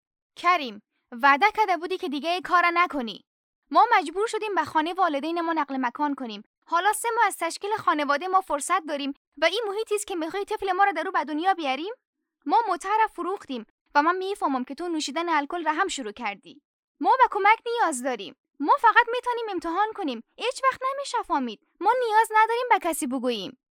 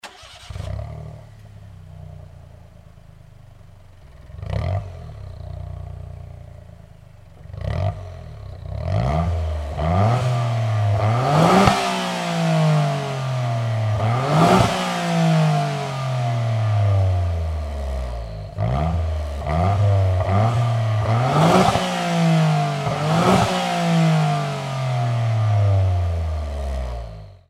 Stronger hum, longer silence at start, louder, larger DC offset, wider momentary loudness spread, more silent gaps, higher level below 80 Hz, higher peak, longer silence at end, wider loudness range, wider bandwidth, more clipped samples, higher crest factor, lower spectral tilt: neither; first, 0.4 s vs 0.05 s; second, -24 LUFS vs -20 LUFS; neither; second, 12 LU vs 20 LU; first, 3.27-3.62 s, 6.46-6.62 s, 9.17-9.32 s, 12.07-12.13 s, 13.70-13.85 s, 16.65-16.95 s, 18.39-18.44 s vs none; second, -66 dBFS vs -34 dBFS; second, -4 dBFS vs 0 dBFS; about the same, 0.2 s vs 0.15 s; second, 3 LU vs 14 LU; first, 17 kHz vs 14 kHz; neither; about the same, 22 dB vs 20 dB; second, -2 dB/octave vs -6.5 dB/octave